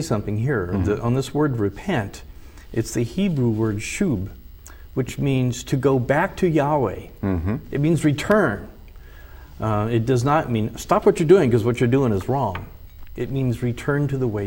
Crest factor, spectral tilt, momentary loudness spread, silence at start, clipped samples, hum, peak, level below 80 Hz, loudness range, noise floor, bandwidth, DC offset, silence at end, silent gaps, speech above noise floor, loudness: 18 dB; -7 dB/octave; 10 LU; 0 s; under 0.1%; none; -2 dBFS; -42 dBFS; 4 LU; -41 dBFS; 16.5 kHz; under 0.1%; 0 s; none; 20 dB; -21 LUFS